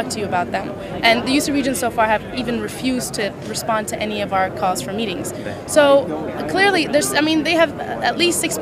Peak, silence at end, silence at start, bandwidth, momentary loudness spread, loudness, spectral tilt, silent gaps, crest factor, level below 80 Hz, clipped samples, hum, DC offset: 0 dBFS; 0 s; 0 s; 15.5 kHz; 9 LU; -19 LUFS; -3.5 dB/octave; none; 18 dB; -46 dBFS; under 0.1%; none; under 0.1%